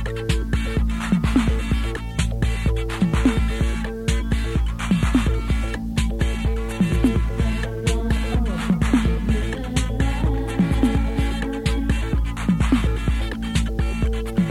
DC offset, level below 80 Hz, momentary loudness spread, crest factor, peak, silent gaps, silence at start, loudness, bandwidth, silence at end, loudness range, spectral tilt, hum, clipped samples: under 0.1%; -24 dBFS; 5 LU; 16 dB; -6 dBFS; none; 0 s; -22 LUFS; 12.5 kHz; 0 s; 1 LU; -6.5 dB/octave; none; under 0.1%